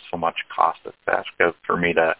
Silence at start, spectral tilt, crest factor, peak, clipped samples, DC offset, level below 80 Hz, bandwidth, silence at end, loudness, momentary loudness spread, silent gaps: 0.05 s; -8.5 dB/octave; 22 dB; -2 dBFS; under 0.1%; under 0.1%; -54 dBFS; 4 kHz; 0.05 s; -22 LUFS; 5 LU; none